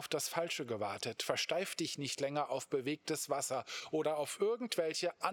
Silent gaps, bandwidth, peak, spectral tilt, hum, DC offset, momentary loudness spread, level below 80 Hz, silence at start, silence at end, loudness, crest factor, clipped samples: none; over 20 kHz; -16 dBFS; -3 dB/octave; none; under 0.1%; 4 LU; -88 dBFS; 0 s; 0 s; -37 LUFS; 20 dB; under 0.1%